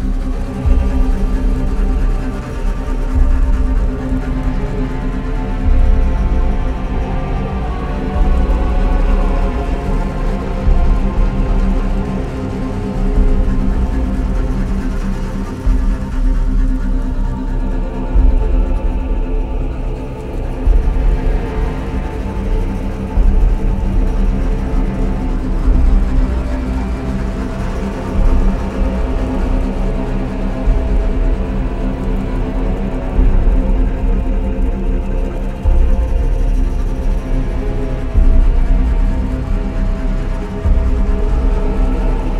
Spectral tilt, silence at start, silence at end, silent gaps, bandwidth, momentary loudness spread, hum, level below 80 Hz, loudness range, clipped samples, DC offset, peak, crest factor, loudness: -8 dB/octave; 0 s; 0 s; none; 6 kHz; 5 LU; none; -14 dBFS; 2 LU; under 0.1%; under 0.1%; 0 dBFS; 14 dB; -19 LUFS